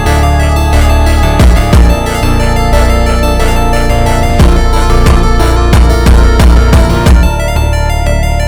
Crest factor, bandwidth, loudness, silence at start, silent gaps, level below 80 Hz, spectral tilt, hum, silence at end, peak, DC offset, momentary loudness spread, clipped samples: 6 dB; 19.5 kHz; -9 LUFS; 0 s; none; -8 dBFS; -6 dB/octave; none; 0 s; 0 dBFS; under 0.1%; 5 LU; 3%